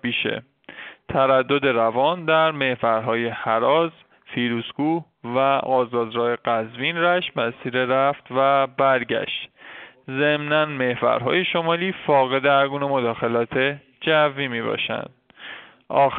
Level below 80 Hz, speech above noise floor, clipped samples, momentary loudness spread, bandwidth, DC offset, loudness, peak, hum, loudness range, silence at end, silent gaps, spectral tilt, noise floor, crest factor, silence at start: -62 dBFS; 22 dB; under 0.1%; 12 LU; 4.5 kHz; under 0.1%; -21 LUFS; -6 dBFS; none; 2 LU; 0 s; none; -3 dB/octave; -43 dBFS; 16 dB; 0.05 s